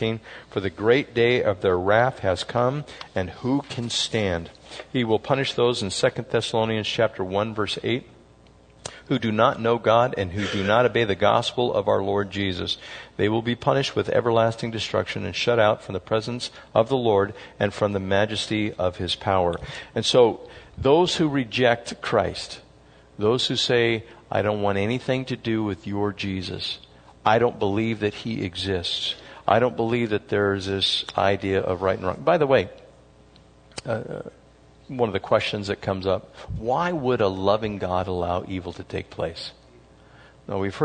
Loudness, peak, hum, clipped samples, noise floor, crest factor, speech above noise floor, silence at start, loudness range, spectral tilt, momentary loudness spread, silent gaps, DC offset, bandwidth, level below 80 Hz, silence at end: -23 LUFS; -2 dBFS; none; under 0.1%; -52 dBFS; 22 dB; 29 dB; 0 s; 4 LU; -5 dB/octave; 11 LU; none; under 0.1%; 9.6 kHz; -54 dBFS; 0 s